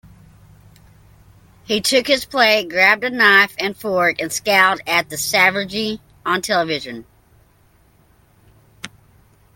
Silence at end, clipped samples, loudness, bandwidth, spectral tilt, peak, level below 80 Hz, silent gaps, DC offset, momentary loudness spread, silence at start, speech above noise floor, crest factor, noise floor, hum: 0.7 s; under 0.1%; -16 LUFS; 17 kHz; -2 dB/octave; 0 dBFS; -56 dBFS; none; under 0.1%; 15 LU; 1.7 s; 37 dB; 20 dB; -54 dBFS; none